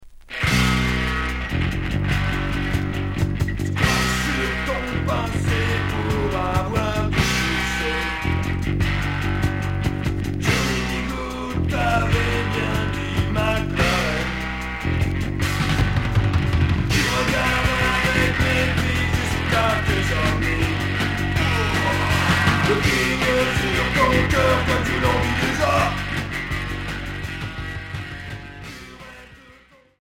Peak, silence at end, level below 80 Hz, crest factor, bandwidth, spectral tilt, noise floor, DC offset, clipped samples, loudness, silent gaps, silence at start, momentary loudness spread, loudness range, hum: -4 dBFS; 0.7 s; -30 dBFS; 18 dB; 16.5 kHz; -5 dB/octave; -51 dBFS; under 0.1%; under 0.1%; -21 LUFS; none; 0 s; 8 LU; 4 LU; none